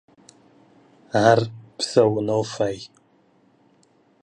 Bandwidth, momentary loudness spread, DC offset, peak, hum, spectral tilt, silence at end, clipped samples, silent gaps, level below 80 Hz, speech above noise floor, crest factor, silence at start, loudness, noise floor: 11.5 kHz; 15 LU; under 0.1%; -2 dBFS; none; -5.5 dB/octave; 1.35 s; under 0.1%; none; -62 dBFS; 40 dB; 22 dB; 1.15 s; -21 LUFS; -60 dBFS